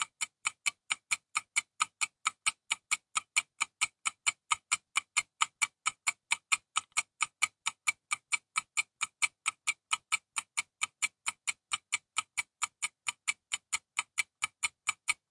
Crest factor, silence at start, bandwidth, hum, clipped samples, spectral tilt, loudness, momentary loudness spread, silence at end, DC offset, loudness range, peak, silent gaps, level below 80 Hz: 26 dB; 0 s; 11.5 kHz; none; under 0.1%; 3.5 dB/octave; -33 LUFS; 5 LU; 0.2 s; under 0.1%; 3 LU; -10 dBFS; none; -82 dBFS